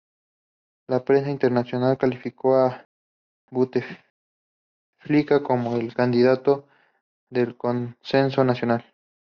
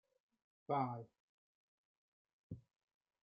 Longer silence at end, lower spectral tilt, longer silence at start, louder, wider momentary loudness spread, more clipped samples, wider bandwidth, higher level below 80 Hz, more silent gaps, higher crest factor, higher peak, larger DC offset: about the same, 0.55 s vs 0.65 s; second, -6 dB/octave vs -7.5 dB/octave; first, 0.9 s vs 0.7 s; first, -23 LUFS vs -42 LUFS; second, 8 LU vs 21 LU; neither; first, 6.6 kHz vs 5 kHz; first, -66 dBFS vs -80 dBFS; first, 2.85-3.48 s, 4.10-4.93 s, 7.01-7.27 s vs 1.20-2.25 s, 2.33-2.50 s; second, 18 dB vs 24 dB; first, -6 dBFS vs -24 dBFS; neither